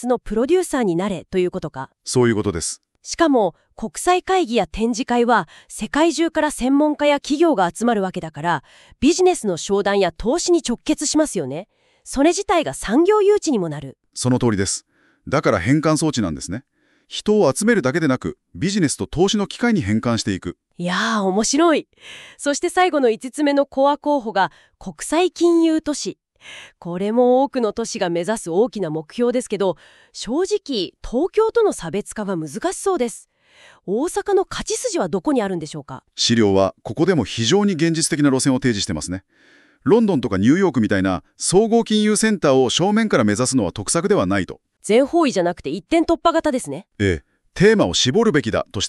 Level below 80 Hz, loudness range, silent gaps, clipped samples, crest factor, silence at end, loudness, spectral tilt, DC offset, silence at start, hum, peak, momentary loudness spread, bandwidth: -46 dBFS; 4 LU; none; under 0.1%; 16 dB; 0 s; -19 LUFS; -4.5 dB/octave; under 0.1%; 0 s; none; -4 dBFS; 12 LU; 13 kHz